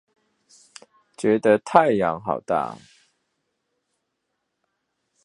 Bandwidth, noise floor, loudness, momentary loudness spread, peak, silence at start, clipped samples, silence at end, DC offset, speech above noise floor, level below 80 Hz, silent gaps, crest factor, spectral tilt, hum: 11 kHz; -78 dBFS; -21 LUFS; 10 LU; 0 dBFS; 1.2 s; under 0.1%; 2.5 s; under 0.1%; 57 dB; -64 dBFS; none; 24 dB; -6 dB/octave; none